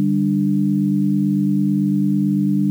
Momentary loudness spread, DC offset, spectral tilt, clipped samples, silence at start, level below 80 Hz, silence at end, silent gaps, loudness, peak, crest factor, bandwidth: 0 LU; under 0.1%; -10.5 dB/octave; under 0.1%; 0 s; -76 dBFS; 0 s; none; -18 LUFS; -10 dBFS; 6 dB; 0.4 kHz